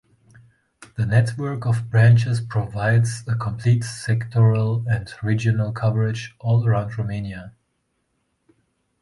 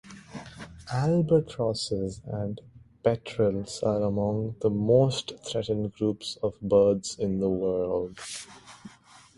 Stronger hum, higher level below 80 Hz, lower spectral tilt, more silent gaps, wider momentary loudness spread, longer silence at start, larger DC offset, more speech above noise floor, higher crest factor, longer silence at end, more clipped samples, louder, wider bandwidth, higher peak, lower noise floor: neither; first, -48 dBFS vs -54 dBFS; about the same, -7 dB/octave vs -6.5 dB/octave; neither; second, 10 LU vs 20 LU; first, 0.8 s vs 0.05 s; neither; first, 52 dB vs 27 dB; about the same, 16 dB vs 18 dB; first, 1.5 s vs 0.5 s; neither; first, -21 LUFS vs -27 LUFS; about the same, 11.5 kHz vs 11.5 kHz; first, -4 dBFS vs -8 dBFS; first, -71 dBFS vs -54 dBFS